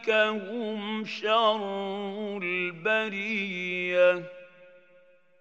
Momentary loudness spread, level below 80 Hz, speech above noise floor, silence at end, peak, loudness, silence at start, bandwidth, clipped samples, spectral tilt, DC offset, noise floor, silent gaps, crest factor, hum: 10 LU; under -90 dBFS; 33 dB; 0.7 s; -10 dBFS; -27 LUFS; 0 s; 7.8 kHz; under 0.1%; -5 dB/octave; under 0.1%; -60 dBFS; none; 18 dB; none